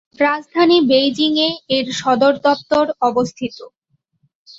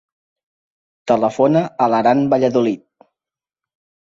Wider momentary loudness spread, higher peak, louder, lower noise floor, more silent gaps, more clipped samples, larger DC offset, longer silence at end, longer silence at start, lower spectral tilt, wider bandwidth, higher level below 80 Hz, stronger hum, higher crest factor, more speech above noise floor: about the same, 7 LU vs 7 LU; about the same, -2 dBFS vs -2 dBFS; about the same, -16 LUFS vs -16 LUFS; second, -64 dBFS vs -90 dBFS; neither; neither; neither; second, 0.9 s vs 1.3 s; second, 0.2 s vs 1.05 s; second, -4 dB/octave vs -7.5 dB/octave; about the same, 7.8 kHz vs 7.8 kHz; about the same, -58 dBFS vs -60 dBFS; neither; about the same, 14 dB vs 16 dB; second, 48 dB vs 75 dB